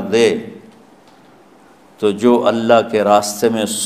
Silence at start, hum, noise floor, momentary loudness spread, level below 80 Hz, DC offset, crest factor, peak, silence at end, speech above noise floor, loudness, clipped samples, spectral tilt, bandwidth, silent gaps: 0 s; none; -46 dBFS; 7 LU; -60 dBFS; 0.1%; 16 dB; 0 dBFS; 0 s; 32 dB; -15 LUFS; under 0.1%; -4 dB/octave; 15.5 kHz; none